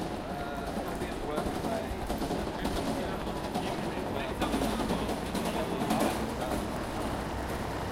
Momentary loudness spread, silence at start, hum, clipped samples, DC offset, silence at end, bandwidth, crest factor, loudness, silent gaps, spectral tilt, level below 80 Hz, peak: 5 LU; 0 s; none; under 0.1%; under 0.1%; 0 s; 17 kHz; 18 dB; -33 LUFS; none; -5 dB/octave; -44 dBFS; -16 dBFS